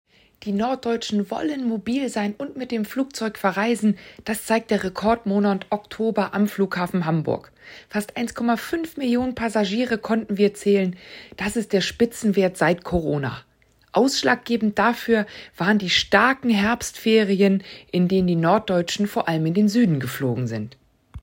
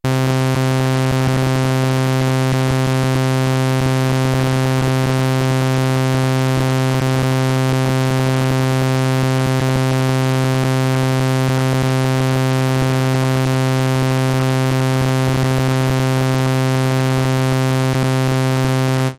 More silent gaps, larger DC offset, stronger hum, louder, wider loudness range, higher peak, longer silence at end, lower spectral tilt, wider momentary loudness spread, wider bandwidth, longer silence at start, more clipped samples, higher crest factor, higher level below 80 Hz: neither; neither; neither; second, -22 LUFS vs -16 LUFS; first, 5 LU vs 0 LU; first, -2 dBFS vs -6 dBFS; about the same, 0 s vs 0.05 s; about the same, -5.5 dB/octave vs -6 dB/octave; first, 10 LU vs 0 LU; about the same, 16.5 kHz vs 15.5 kHz; first, 0.4 s vs 0.05 s; neither; first, 20 dB vs 10 dB; second, -52 dBFS vs -40 dBFS